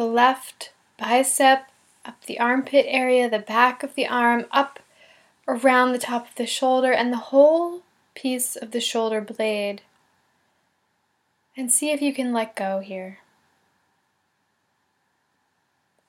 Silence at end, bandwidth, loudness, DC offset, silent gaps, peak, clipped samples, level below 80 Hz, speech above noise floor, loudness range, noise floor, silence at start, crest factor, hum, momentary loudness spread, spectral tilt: 2.95 s; 17 kHz; -21 LUFS; under 0.1%; none; -2 dBFS; under 0.1%; -86 dBFS; 49 dB; 8 LU; -71 dBFS; 0 s; 22 dB; none; 17 LU; -2 dB/octave